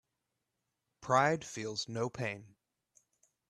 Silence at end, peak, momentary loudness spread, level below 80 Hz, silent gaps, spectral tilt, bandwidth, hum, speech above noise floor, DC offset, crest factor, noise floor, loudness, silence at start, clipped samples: 1 s; -12 dBFS; 14 LU; -74 dBFS; none; -4.5 dB/octave; 13 kHz; none; 52 dB; under 0.1%; 24 dB; -86 dBFS; -34 LUFS; 1 s; under 0.1%